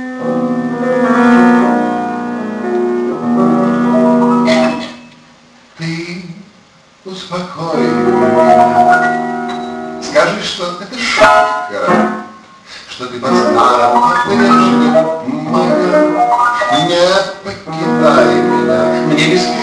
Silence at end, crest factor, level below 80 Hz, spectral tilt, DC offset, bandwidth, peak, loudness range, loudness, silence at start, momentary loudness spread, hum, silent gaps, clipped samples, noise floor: 0 s; 12 dB; -50 dBFS; -5 dB/octave; under 0.1%; 10.5 kHz; 0 dBFS; 5 LU; -12 LUFS; 0 s; 14 LU; none; none; under 0.1%; -45 dBFS